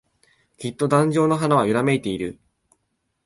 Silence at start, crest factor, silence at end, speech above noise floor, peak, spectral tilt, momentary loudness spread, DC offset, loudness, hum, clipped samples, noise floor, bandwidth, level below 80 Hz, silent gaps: 0.6 s; 18 dB; 0.95 s; 53 dB; -4 dBFS; -6.5 dB/octave; 14 LU; under 0.1%; -20 LUFS; none; under 0.1%; -73 dBFS; 11.5 kHz; -58 dBFS; none